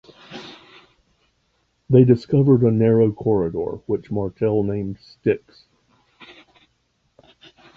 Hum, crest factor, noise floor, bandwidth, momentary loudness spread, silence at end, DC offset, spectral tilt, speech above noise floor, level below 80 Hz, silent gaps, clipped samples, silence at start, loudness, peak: none; 20 dB; -67 dBFS; 6.4 kHz; 21 LU; 2.4 s; under 0.1%; -10.5 dB/octave; 49 dB; -52 dBFS; none; under 0.1%; 0.3 s; -19 LUFS; -2 dBFS